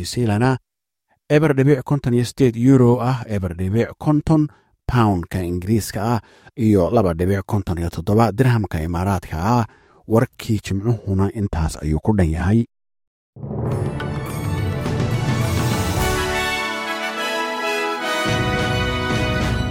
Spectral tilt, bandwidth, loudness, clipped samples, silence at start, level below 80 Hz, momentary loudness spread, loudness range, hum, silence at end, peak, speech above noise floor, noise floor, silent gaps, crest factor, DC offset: -6.5 dB/octave; 16.5 kHz; -20 LUFS; under 0.1%; 0 s; -36 dBFS; 8 LU; 5 LU; none; 0 s; -2 dBFS; 50 dB; -68 dBFS; 13.07-13.33 s; 18 dB; under 0.1%